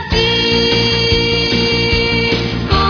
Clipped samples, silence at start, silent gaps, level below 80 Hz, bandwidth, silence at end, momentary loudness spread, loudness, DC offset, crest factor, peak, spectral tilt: under 0.1%; 0 s; none; -26 dBFS; 5.4 kHz; 0 s; 3 LU; -12 LUFS; under 0.1%; 14 dB; 0 dBFS; -5 dB/octave